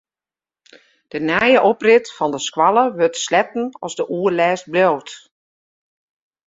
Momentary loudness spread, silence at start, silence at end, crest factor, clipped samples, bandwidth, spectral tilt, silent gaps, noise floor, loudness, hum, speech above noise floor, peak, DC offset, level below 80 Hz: 12 LU; 1.15 s; 1.3 s; 18 dB; under 0.1%; 7.8 kHz; -4 dB/octave; none; under -90 dBFS; -17 LUFS; none; over 73 dB; -2 dBFS; under 0.1%; -62 dBFS